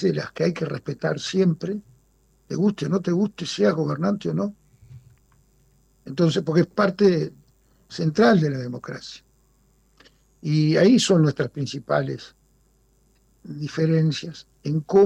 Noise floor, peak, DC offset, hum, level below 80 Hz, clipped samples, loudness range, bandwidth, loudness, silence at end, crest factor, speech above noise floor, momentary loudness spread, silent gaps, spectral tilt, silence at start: -61 dBFS; -8 dBFS; under 0.1%; none; -60 dBFS; under 0.1%; 4 LU; 11 kHz; -22 LUFS; 0 s; 16 dB; 40 dB; 17 LU; none; -6.5 dB/octave; 0 s